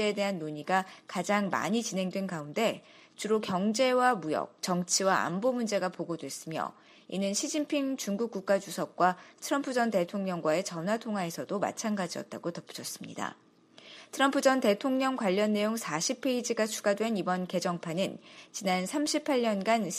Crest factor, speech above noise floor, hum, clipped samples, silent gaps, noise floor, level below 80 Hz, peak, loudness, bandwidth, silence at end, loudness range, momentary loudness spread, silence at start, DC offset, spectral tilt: 20 dB; 24 dB; none; under 0.1%; none; -55 dBFS; -78 dBFS; -10 dBFS; -30 LUFS; 15 kHz; 0 s; 4 LU; 11 LU; 0 s; under 0.1%; -4 dB/octave